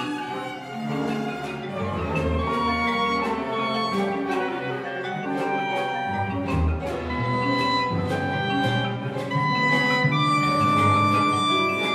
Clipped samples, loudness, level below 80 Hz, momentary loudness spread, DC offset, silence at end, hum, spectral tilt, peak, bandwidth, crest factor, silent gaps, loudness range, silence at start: under 0.1%; -24 LUFS; -40 dBFS; 10 LU; under 0.1%; 0 s; none; -6 dB/octave; -10 dBFS; 15 kHz; 14 dB; none; 5 LU; 0 s